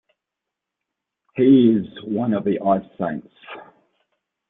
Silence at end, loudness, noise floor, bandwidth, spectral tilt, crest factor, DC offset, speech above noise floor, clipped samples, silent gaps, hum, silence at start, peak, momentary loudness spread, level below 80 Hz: 0.85 s; -19 LUFS; -84 dBFS; 3.9 kHz; -11.5 dB/octave; 18 dB; under 0.1%; 66 dB; under 0.1%; none; none; 1.35 s; -4 dBFS; 25 LU; -62 dBFS